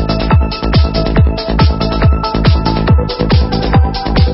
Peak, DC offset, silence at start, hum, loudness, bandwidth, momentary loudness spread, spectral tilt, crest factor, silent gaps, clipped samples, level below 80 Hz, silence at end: 0 dBFS; under 0.1%; 0 s; none; -12 LUFS; 5.8 kHz; 1 LU; -10 dB/octave; 10 dB; none; under 0.1%; -14 dBFS; 0 s